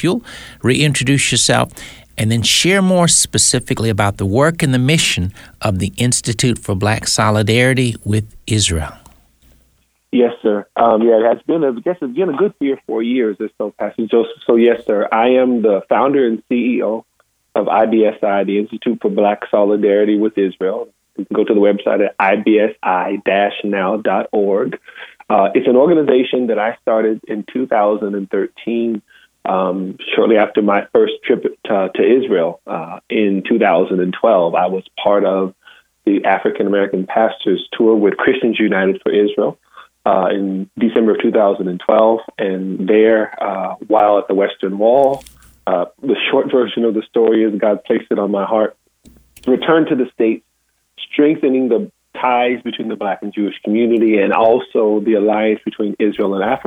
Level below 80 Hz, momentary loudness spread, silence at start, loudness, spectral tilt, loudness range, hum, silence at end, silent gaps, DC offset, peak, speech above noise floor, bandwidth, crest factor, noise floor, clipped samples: -46 dBFS; 9 LU; 0 s; -15 LUFS; -4.5 dB/octave; 3 LU; none; 0.05 s; none; under 0.1%; 0 dBFS; 50 dB; 16.5 kHz; 14 dB; -64 dBFS; under 0.1%